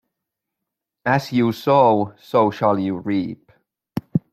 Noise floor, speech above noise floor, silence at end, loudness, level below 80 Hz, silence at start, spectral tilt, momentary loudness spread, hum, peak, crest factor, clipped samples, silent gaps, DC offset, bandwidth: -82 dBFS; 64 dB; 0.15 s; -19 LUFS; -62 dBFS; 1.05 s; -7.5 dB/octave; 16 LU; none; -2 dBFS; 18 dB; under 0.1%; none; under 0.1%; 15.5 kHz